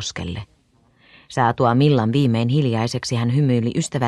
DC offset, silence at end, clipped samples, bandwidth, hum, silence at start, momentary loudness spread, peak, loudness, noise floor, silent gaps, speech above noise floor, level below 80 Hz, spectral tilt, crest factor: under 0.1%; 0 s; under 0.1%; 11.5 kHz; none; 0 s; 13 LU; -4 dBFS; -19 LUFS; -58 dBFS; none; 40 dB; -52 dBFS; -6.5 dB/octave; 16 dB